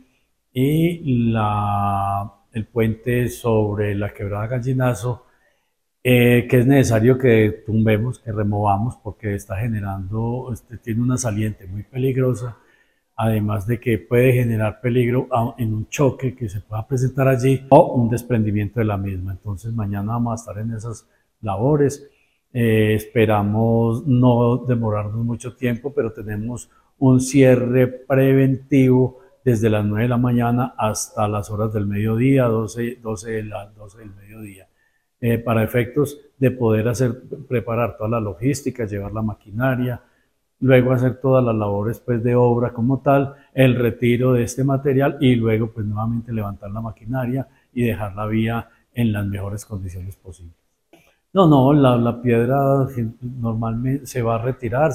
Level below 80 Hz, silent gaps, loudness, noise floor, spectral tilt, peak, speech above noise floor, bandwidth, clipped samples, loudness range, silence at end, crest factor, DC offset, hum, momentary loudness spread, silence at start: -44 dBFS; none; -20 LUFS; -71 dBFS; -7.5 dB/octave; 0 dBFS; 52 dB; 15.5 kHz; under 0.1%; 7 LU; 0 s; 18 dB; under 0.1%; none; 13 LU; 0.55 s